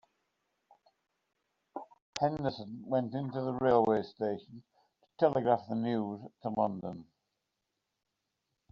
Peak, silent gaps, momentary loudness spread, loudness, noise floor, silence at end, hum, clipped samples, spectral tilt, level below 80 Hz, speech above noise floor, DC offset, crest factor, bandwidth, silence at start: -12 dBFS; 2.02-2.13 s; 17 LU; -33 LUFS; -85 dBFS; 1.7 s; none; under 0.1%; -6 dB/octave; -70 dBFS; 53 dB; under 0.1%; 22 dB; 7.4 kHz; 1.75 s